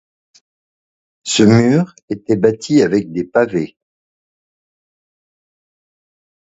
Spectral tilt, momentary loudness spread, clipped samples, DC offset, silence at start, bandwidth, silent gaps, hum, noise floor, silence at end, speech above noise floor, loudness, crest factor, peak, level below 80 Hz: -5.5 dB/octave; 14 LU; under 0.1%; under 0.1%; 1.25 s; 8 kHz; 2.03-2.08 s; none; under -90 dBFS; 2.85 s; over 76 dB; -15 LUFS; 18 dB; 0 dBFS; -54 dBFS